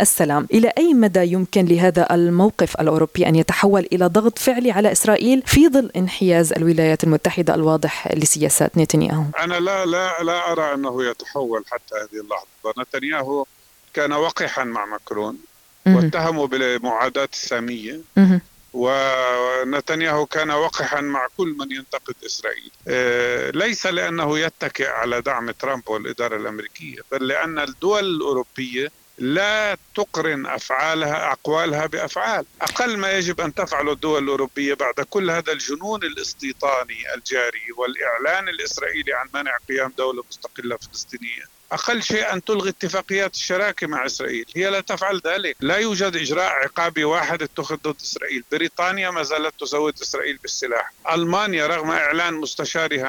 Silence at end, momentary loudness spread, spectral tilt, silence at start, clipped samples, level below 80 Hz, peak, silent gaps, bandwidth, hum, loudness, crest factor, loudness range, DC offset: 0 s; 11 LU; -4.5 dB/octave; 0 s; under 0.1%; -50 dBFS; -4 dBFS; none; 19 kHz; none; -20 LUFS; 16 dB; 8 LU; under 0.1%